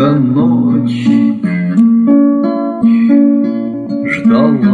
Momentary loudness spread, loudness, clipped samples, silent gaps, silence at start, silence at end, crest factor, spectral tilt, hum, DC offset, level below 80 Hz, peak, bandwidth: 7 LU; -11 LUFS; under 0.1%; none; 0 s; 0 s; 10 dB; -9 dB/octave; none; under 0.1%; -52 dBFS; 0 dBFS; 4.8 kHz